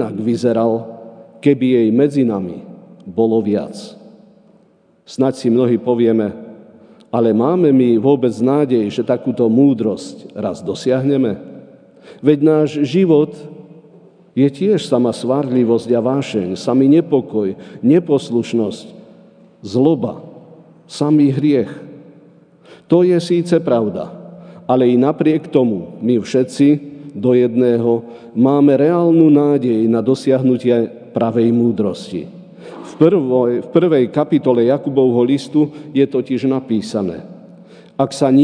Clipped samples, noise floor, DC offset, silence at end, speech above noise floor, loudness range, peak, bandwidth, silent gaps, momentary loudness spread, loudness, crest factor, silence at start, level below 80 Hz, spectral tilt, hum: under 0.1%; -53 dBFS; under 0.1%; 0 s; 39 dB; 5 LU; 0 dBFS; 10 kHz; none; 14 LU; -15 LUFS; 16 dB; 0 s; -64 dBFS; -8 dB/octave; none